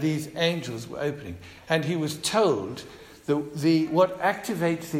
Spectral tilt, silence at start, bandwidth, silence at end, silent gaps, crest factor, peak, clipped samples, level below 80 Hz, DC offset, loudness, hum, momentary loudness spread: -5 dB/octave; 0 s; 16 kHz; 0 s; none; 18 dB; -8 dBFS; under 0.1%; -60 dBFS; under 0.1%; -26 LUFS; none; 16 LU